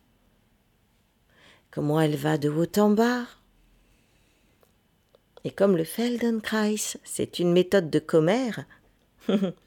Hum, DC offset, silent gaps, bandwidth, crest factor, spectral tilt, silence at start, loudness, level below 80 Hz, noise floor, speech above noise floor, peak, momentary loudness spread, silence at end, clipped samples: none; under 0.1%; none; 18 kHz; 18 dB; -5.5 dB/octave; 1.75 s; -25 LUFS; -64 dBFS; -66 dBFS; 42 dB; -8 dBFS; 12 LU; 0.15 s; under 0.1%